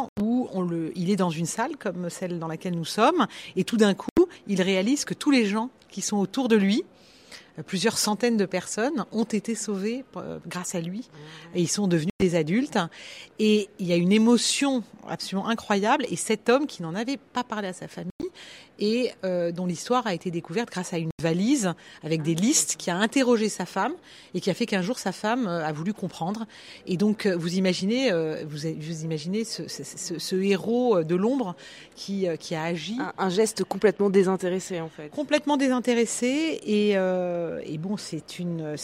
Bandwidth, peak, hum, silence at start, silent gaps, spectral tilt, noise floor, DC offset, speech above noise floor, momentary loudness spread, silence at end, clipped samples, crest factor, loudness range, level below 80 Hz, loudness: 15.5 kHz; -6 dBFS; none; 0 s; 0.09-0.16 s, 4.11-4.16 s, 12.10-12.19 s, 18.11-18.19 s, 21.12-21.18 s; -4.5 dB/octave; -49 dBFS; under 0.1%; 23 dB; 12 LU; 0 s; under 0.1%; 20 dB; 5 LU; -64 dBFS; -26 LUFS